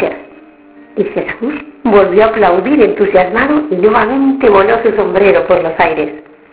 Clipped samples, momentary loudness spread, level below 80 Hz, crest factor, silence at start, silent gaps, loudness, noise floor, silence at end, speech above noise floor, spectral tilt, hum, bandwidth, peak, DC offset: 0.6%; 10 LU; -42 dBFS; 10 dB; 0 s; none; -11 LUFS; -39 dBFS; 0.3 s; 29 dB; -10 dB/octave; none; 4 kHz; 0 dBFS; under 0.1%